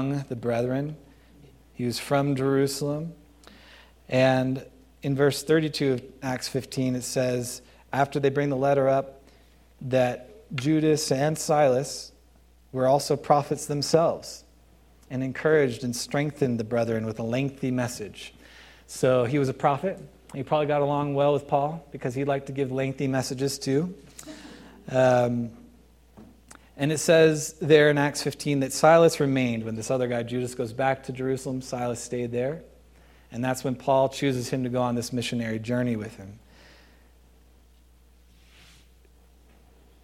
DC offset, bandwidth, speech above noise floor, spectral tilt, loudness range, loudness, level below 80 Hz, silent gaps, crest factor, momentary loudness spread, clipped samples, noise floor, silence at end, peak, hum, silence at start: under 0.1%; 16 kHz; 32 dB; -5.5 dB/octave; 6 LU; -25 LUFS; -58 dBFS; none; 22 dB; 15 LU; under 0.1%; -57 dBFS; 3.65 s; -4 dBFS; none; 0 s